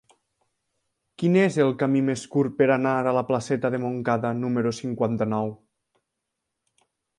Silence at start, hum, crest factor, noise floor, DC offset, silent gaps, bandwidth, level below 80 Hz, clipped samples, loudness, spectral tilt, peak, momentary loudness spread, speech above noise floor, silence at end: 1.2 s; none; 18 dB; -82 dBFS; under 0.1%; none; 11.5 kHz; -64 dBFS; under 0.1%; -24 LUFS; -7 dB/octave; -6 dBFS; 7 LU; 59 dB; 1.65 s